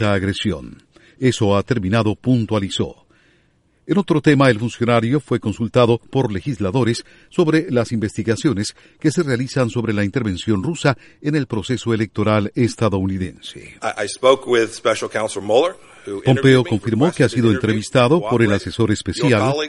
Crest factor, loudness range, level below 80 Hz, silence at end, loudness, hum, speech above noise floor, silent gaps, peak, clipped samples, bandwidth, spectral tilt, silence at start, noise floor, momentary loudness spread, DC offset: 18 dB; 4 LU; -48 dBFS; 0 s; -18 LUFS; none; 41 dB; none; 0 dBFS; under 0.1%; 11.5 kHz; -6 dB/octave; 0 s; -59 dBFS; 8 LU; under 0.1%